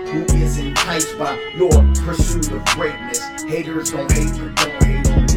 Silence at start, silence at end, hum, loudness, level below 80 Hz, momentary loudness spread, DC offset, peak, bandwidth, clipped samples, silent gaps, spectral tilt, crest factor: 0 s; 0 s; none; -18 LUFS; -20 dBFS; 9 LU; under 0.1%; 0 dBFS; 16.5 kHz; under 0.1%; none; -4.5 dB/octave; 16 dB